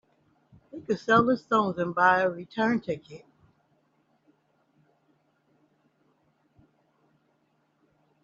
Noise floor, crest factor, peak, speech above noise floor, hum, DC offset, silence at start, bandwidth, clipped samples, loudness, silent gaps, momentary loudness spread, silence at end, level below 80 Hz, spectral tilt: -71 dBFS; 24 dB; -8 dBFS; 45 dB; none; under 0.1%; 0.75 s; 7.6 kHz; under 0.1%; -25 LUFS; none; 23 LU; 5.05 s; -68 dBFS; -4 dB/octave